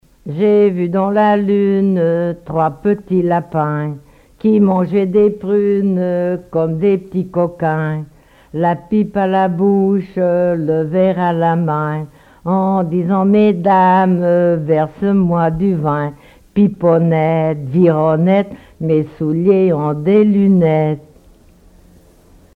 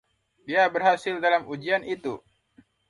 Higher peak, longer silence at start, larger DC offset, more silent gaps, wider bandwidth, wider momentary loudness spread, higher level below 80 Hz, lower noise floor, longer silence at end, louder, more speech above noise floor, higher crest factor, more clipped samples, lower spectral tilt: first, 0 dBFS vs -8 dBFS; second, 0.25 s vs 0.45 s; neither; neither; second, 4.6 kHz vs 11.5 kHz; second, 8 LU vs 12 LU; first, -48 dBFS vs -70 dBFS; second, -46 dBFS vs -60 dBFS; first, 1.55 s vs 0.7 s; first, -15 LUFS vs -25 LUFS; second, 32 dB vs 36 dB; about the same, 14 dB vs 18 dB; neither; first, -10 dB/octave vs -5 dB/octave